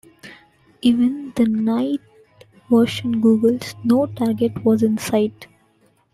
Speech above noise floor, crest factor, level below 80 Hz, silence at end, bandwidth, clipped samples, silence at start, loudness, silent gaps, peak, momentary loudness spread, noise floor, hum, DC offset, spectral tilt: 41 dB; 14 dB; -58 dBFS; 0.7 s; 14 kHz; under 0.1%; 0.25 s; -19 LUFS; none; -4 dBFS; 5 LU; -59 dBFS; none; under 0.1%; -6.5 dB/octave